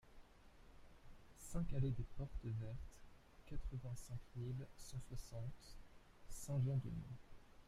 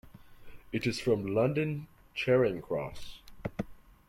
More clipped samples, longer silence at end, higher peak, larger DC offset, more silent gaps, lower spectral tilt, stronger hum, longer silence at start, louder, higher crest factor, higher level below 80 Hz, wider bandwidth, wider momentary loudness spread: neither; second, 0.05 s vs 0.3 s; second, -28 dBFS vs -14 dBFS; neither; neither; about the same, -7 dB/octave vs -6.5 dB/octave; neither; about the same, 0.05 s vs 0.05 s; second, -48 LUFS vs -32 LUFS; about the same, 18 dB vs 18 dB; about the same, -56 dBFS vs -56 dBFS; about the same, 15 kHz vs 16.5 kHz; first, 25 LU vs 16 LU